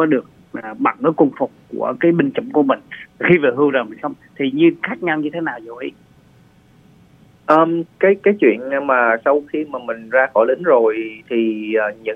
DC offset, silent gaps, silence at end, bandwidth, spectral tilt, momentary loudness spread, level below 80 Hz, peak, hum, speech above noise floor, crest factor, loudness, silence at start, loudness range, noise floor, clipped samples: under 0.1%; none; 0 s; 5.2 kHz; -8.5 dB/octave; 13 LU; -62 dBFS; 0 dBFS; none; 33 dB; 18 dB; -17 LUFS; 0 s; 5 LU; -50 dBFS; under 0.1%